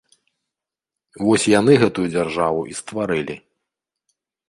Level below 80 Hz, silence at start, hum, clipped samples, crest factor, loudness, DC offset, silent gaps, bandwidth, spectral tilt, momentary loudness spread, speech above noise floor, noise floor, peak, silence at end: -54 dBFS; 1.2 s; none; under 0.1%; 20 dB; -19 LUFS; under 0.1%; none; 11.5 kHz; -5 dB/octave; 13 LU; 68 dB; -86 dBFS; -2 dBFS; 1.1 s